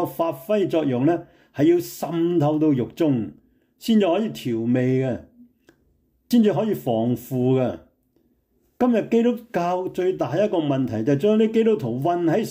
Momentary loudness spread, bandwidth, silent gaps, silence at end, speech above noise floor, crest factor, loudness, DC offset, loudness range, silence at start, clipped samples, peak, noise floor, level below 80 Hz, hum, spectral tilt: 7 LU; 16 kHz; none; 0 s; 45 dB; 14 dB; -22 LUFS; under 0.1%; 3 LU; 0 s; under 0.1%; -8 dBFS; -65 dBFS; -62 dBFS; none; -7.5 dB/octave